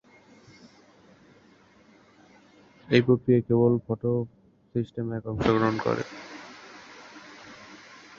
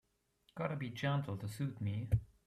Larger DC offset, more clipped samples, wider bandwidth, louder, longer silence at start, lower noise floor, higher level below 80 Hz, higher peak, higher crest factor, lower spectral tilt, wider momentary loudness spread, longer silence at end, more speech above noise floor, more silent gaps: neither; neither; second, 7.2 kHz vs 14.5 kHz; first, -26 LUFS vs -40 LUFS; first, 2.9 s vs 0.55 s; second, -57 dBFS vs -75 dBFS; about the same, -56 dBFS vs -54 dBFS; first, -6 dBFS vs -22 dBFS; first, 24 dB vs 18 dB; about the same, -7.5 dB/octave vs -7 dB/octave; first, 24 LU vs 6 LU; first, 0.45 s vs 0.2 s; second, 33 dB vs 37 dB; neither